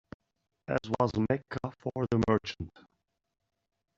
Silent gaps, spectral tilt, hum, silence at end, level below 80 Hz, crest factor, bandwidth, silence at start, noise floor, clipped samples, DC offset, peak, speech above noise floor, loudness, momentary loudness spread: none; -6 dB/octave; none; 1.3 s; -58 dBFS; 22 dB; 7.8 kHz; 0.7 s; -81 dBFS; under 0.1%; under 0.1%; -10 dBFS; 50 dB; -31 LUFS; 14 LU